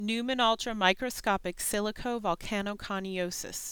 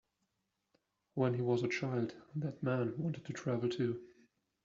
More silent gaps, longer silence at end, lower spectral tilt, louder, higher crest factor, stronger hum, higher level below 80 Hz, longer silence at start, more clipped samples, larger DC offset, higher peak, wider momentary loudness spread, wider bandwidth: neither; second, 0 s vs 0.55 s; second, -3 dB/octave vs -7 dB/octave; first, -30 LUFS vs -37 LUFS; about the same, 22 dB vs 18 dB; neither; first, -52 dBFS vs -76 dBFS; second, 0 s vs 1.15 s; neither; neither; first, -8 dBFS vs -20 dBFS; about the same, 7 LU vs 8 LU; first, 19.5 kHz vs 7.6 kHz